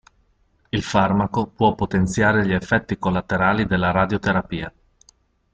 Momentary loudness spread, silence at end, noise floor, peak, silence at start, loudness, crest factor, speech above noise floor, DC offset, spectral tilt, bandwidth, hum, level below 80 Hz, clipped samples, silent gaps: 8 LU; 0.85 s; -62 dBFS; -4 dBFS; 0.75 s; -20 LUFS; 18 dB; 42 dB; under 0.1%; -6.5 dB/octave; 9 kHz; none; -44 dBFS; under 0.1%; none